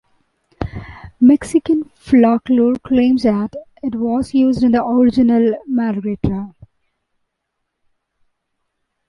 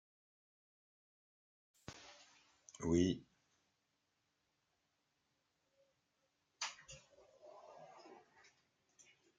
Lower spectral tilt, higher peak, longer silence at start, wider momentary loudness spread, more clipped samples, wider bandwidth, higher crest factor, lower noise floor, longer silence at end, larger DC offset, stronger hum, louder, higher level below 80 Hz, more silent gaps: first, -7.5 dB/octave vs -5 dB/octave; first, -2 dBFS vs -22 dBFS; second, 0.6 s vs 1.9 s; second, 14 LU vs 27 LU; neither; first, 11.5 kHz vs 9.4 kHz; second, 14 dB vs 26 dB; second, -75 dBFS vs -85 dBFS; first, 2.6 s vs 1.25 s; neither; neither; first, -15 LUFS vs -40 LUFS; first, -42 dBFS vs -74 dBFS; neither